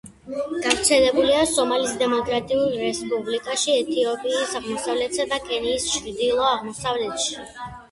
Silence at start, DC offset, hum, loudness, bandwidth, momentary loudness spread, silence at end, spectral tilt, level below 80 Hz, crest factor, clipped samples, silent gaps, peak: 0.05 s; under 0.1%; none; -22 LUFS; 12 kHz; 9 LU; 0.05 s; -2 dB/octave; -52 dBFS; 20 dB; under 0.1%; none; -4 dBFS